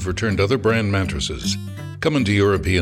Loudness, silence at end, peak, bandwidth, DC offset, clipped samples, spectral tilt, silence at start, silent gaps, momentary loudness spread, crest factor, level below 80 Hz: -20 LUFS; 0 s; -6 dBFS; 13 kHz; under 0.1%; under 0.1%; -5.5 dB/octave; 0 s; none; 7 LU; 14 dB; -38 dBFS